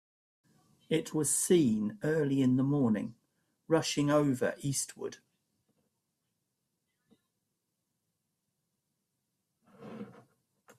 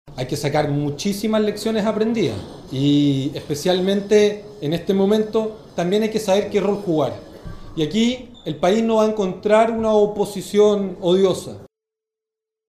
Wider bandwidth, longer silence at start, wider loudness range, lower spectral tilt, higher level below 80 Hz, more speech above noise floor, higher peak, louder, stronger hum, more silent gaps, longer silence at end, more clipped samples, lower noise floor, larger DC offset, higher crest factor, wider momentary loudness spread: about the same, 15.5 kHz vs 15.5 kHz; first, 0.9 s vs 0.05 s; first, 12 LU vs 3 LU; about the same, -5 dB/octave vs -6 dB/octave; second, -72 dBFS vs -48 dBFS; second, 54 dB vs 67 dB; second, -14 dBFS vs -4 dBFS; second, -30 LUFS vs -19 LUFS; neither; neither; second, 0.7 s vs 1 s; neither; about the same, -84 dBFS vs -86 dBFS; neither; about the same, 20 dB vs 16 dB; first, 18 LU vs 11 LU